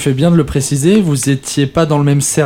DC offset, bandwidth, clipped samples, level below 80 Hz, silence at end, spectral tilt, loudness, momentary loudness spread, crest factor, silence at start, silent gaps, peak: under 0.1%; 16 kHz; under 0.1%; -36 dBFS; 0 s; -5.5 dB/octave; -12 LUFS; 4 LU; 12 dB; 0 s; none; 0 dBFS